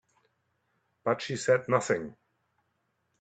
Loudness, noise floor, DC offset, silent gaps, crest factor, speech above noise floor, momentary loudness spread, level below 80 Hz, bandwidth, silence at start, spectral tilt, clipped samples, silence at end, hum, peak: -29 LUFS; -77 dBFS; under 0.1%; none; 24 dB; 49 dB; 9 LU; -72 dBFS; 9.2 kHz; 1.05 s; -4.5 dB/octave; under 0.1%; 1.1 s; none; -8 dBFS